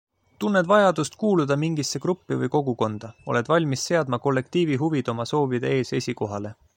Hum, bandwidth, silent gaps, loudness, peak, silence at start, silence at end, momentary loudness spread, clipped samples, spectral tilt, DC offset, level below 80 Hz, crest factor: none; 16.5 kHz; none; -24 LUFS; -4 dBFS; 0.4 s; 0.25 s; 9 LU; under 0.1%; -5.5 dB/octave; under 0.1%; -64 dBFS; 18 dB